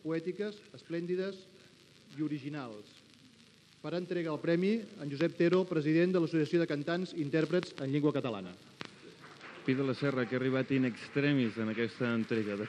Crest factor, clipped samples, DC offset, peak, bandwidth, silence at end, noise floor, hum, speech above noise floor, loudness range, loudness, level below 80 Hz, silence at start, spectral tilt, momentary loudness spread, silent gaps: 20 dB; under 0.1%; under 0.1%; -14 dBFS; 10.5 kHz; 0 s; -61 dBFS; none; 28 dB; 10 LU; -33 LUFS; -82 dBFS; 0.05 s; -7.5 dB/octave; 18 LU; none